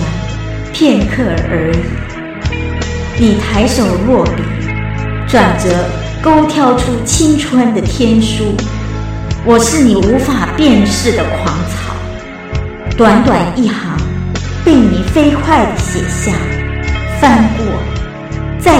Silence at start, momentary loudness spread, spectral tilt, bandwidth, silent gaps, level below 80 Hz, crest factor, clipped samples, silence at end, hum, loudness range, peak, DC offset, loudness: 0 s; 11 LU; -5.5 dB/octave; 15.5 kHz; none; -22 dBFS; 12 dB; 0.2%; 0 s; none; 3 LU; 0 dBFS; under 0.1%; -12 LUFS